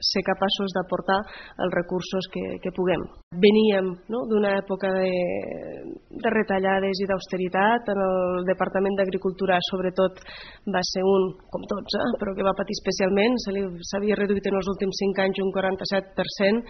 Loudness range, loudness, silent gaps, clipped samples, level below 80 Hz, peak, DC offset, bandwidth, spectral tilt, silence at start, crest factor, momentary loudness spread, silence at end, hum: 2 LU; -24 LUFS; 3.23-3.31 s; under 0.1%; -52 dBFS; -6 dBFS; under 0.1%; 6.4 kHz; -4 dB/octave; 0 s; 18 dB; 9 LU; 0 s; none